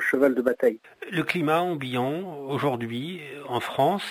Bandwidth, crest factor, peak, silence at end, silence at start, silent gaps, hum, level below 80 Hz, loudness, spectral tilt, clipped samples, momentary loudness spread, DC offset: 16 kHz; 18 dB; -8 dBFS; 0 s; 0 s; none; none; -68 dBFS; -26 LUFS; -6 dB/octave; under 0.1%; 11 LU; under 0.1%